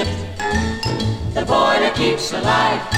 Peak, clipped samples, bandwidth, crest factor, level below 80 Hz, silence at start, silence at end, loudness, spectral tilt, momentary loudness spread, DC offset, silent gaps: -2 dBFS; under 0.1%; 16 kHz; 16 dB; -34 dBFS; 0 s; 0 s; -18 LUFS; -4.5 dB/octave; 7 LU; under 0.1%; none